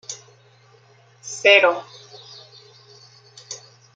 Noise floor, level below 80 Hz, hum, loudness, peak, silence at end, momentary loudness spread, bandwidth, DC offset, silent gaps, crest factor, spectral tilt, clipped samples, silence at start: -53 dBFS; -82 dBFS; none; -16 LUFS; -2 dBFS; 0.4 s; 28 LU; 9.2 kHz; under 0.1%; none; 22 dB; -1 dB/octave; under 0.1%; 0.1 s